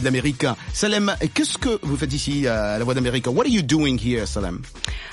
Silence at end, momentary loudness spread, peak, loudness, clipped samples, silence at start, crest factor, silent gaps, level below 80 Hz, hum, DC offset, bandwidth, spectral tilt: 0 s; 7 LU; -4 dBFS; -22 LUFS; under 0.1%; 0 s; 18 dB; none; -36 dBFS; none; under 0.1%; 11.5 kHz; -4.5 dB/octave